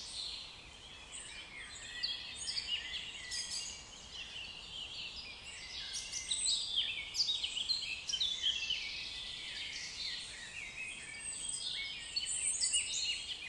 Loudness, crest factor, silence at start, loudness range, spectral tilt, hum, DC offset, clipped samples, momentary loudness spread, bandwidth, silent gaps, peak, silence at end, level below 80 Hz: -37 LUFS; 20 dB; 0 s; 7 LU; 1.5 dB/octave; none; under 0.1%; under 0.1%; 14 LU; 12 kHz; none; -20 dBFS; 0 s; -64 dBFS